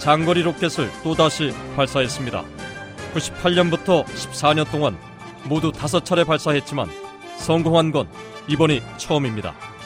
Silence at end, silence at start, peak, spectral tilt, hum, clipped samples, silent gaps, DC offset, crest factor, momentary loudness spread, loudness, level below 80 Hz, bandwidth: 0 s; 0 s; -2 dBFS; -5 dB/octave; none; under 0.1%; none; under 0.1%; 20 dB; 15 LU; -21 LUFS; -48 dBFS; 16 kHz